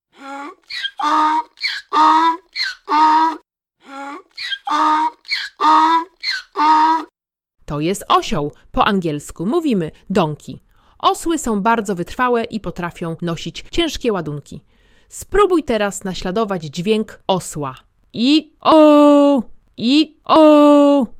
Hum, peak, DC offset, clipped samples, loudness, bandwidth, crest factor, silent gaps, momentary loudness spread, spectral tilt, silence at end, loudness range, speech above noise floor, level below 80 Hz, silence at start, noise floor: none; 0 dBFS; under 0.1%; under 0.1%; -16 LUFS; 15 kHz; 16 dB; none; 18 LU; -5 dB/octave; 0 s; 6 LU; 42 dB; -42 dBFS; 0.2 s; -58 dBFS